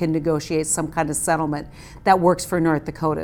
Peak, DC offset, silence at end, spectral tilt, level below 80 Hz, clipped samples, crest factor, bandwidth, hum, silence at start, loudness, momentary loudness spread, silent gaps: -2 dBFS; under 0.1%; 0 s; -5 dB/octave; -44 dBFS; under 0.1%; 18 dB; 18.5 kHz; none; 0 s; -21 LUFS; 8 LU; none